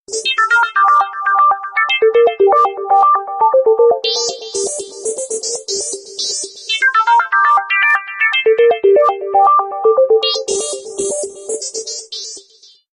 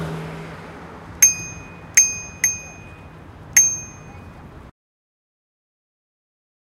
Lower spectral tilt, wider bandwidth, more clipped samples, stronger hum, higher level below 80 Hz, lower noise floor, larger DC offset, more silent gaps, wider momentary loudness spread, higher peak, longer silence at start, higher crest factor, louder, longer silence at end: second, 0.5 dB/octave vs -1 dB/octave; second, 11 kHz vs 16 kHz; neither; neither; second, -62 dBFS vs -50 dBFS; first, -47 dBFS vs -40 dBFS; neither; neither; second, 11 LU vs 24 LU; about the same, -2 dBFS vs 0 dBFS; about the same, 0.1 s vs 0 s; second, 12 dB vs 24 dB; about the same, -14 LUFS vs -16 LUFS; second, 0.55 s vs 2 s